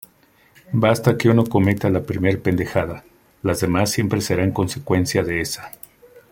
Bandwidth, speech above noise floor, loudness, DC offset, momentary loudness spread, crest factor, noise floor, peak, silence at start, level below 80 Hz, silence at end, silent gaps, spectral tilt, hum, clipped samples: 17 kHz; 37 dB; -20 LUFS; under 0.1%; 11 LU; 18 dB; -56 dBFS; -2 dBFS; 0.7 s; -48 dBFS; 0.1 s; none; -6 dB/octave; none; under 0.1%